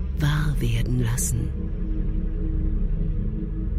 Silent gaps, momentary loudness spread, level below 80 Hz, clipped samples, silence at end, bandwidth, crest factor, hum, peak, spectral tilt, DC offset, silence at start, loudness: none; 6 LU; -26 dBFS; under 0.1%; 0 s; 15 kHz; 14 dB; none; -10 dBFS; -5.5 dB/octave; under 0.1%; 0 s; -26 LUFS